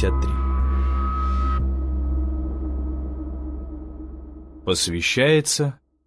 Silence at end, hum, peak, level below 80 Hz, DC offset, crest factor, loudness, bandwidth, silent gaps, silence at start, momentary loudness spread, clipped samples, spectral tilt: 0.3 s; none; -6 dBFS; -26 dBFS; under 0.1%; 18 dB; -23 LUFS; 11 kHz; none; 0 s; 18 LU; under 0.1%; -4.5 dB/octave